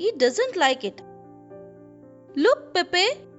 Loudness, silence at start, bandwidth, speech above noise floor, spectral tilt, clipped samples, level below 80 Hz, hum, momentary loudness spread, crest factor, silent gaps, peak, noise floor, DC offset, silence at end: -22 LUFS; 0 s; 8.2 kHz; 25 dB; -2 dB/octave; under 0.1%; -70 dBFS; none; 10 LU; 18 dB; none; -8 dBFS; -48 dBFS; under 0.1%; 0.15 s